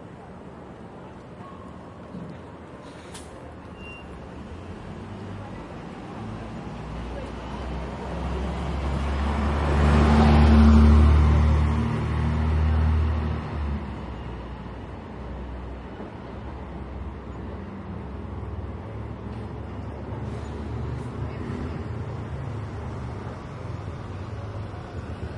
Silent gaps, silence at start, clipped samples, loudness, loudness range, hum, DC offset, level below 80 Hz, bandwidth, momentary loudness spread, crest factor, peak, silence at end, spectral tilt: none; 0 s; under 0.1%; -26 LUFS; 20 LU; none; under 0.1%; -30 dBFS; 10.5 kHz; 22 LU; 20 dB; -6 dBFS; 0 s; -8 dB/octave